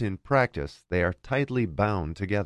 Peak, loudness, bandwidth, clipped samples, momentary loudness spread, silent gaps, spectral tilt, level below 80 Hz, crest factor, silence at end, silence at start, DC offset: -8 dBFS; -27 LUFS; 10.5 kHz; under 0.1%; 6 LU; none; -8 dB/octave; -42 dBFS; 18 dB; 0 s; 0 s; under 0.1%